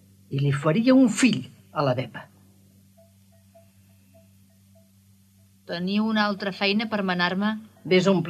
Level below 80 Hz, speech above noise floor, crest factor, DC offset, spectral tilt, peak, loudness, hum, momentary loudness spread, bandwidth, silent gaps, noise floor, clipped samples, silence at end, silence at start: -72 dBFS; 35 dB; 18 dB; under 0.1%; -5.5 dB/octave; -6 dBFS; -23 LUFS; none; 15 LU; 13.5 kHz; none; -57 dBFS; under 0.1%; 0 s; 0.3 s